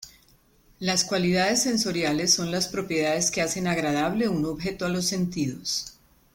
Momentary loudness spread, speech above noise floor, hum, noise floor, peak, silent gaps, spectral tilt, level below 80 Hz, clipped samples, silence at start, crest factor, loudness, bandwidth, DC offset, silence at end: 7 LU; 34 dB; none; -60 dBFS; -6 dBFS; none; -3.5 dB/octave; -54 dBFS; under 0.1%; 0 s; 20 dB; -25 LUFS; 17 kHz; under 0.1%; 0.45 s